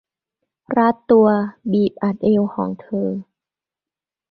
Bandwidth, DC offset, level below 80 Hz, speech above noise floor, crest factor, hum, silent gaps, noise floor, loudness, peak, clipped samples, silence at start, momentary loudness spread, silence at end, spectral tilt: 4.8 kHz; under 0.1%; -58 dBFS; 72 dB; 18 dB; none; none; -89 dBFS; -18 LUFS; -2 dBFS; under 0.1%; 0.7 s; 11 LU; 1.1 s; -10.5 dB/octave